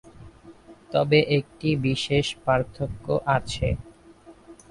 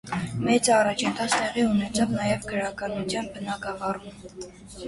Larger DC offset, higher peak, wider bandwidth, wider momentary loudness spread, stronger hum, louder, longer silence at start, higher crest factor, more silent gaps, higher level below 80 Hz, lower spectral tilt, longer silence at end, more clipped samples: neither; about the same, -6 dBFS vs -6 dBFS; about the same, 11.5 kHz vs 11.5 kHz; second, 8 LU vs 18 LU; neither; about the same, -24 LUFS vs -25 LUFS; about the same, 0.05 s vs 0.05 s; about the same, 20 dB vs 20 dB; neither; first, -44 dBFS vs -52 dBFS; first, -6 dB/octave vs -4 dB/octave; first, 0.15 s vs 0 s; neither